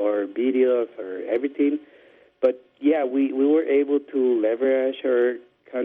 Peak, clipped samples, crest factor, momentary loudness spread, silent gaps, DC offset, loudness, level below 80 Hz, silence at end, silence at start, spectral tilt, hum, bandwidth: -8 dBFS; under 0.1%; 14 dB; 7 LU; none; under 0.1%; -23 LUFS; -72 dBFS; 0 s; 0 s; -7.5 dB/octave; none; 3.8 kHz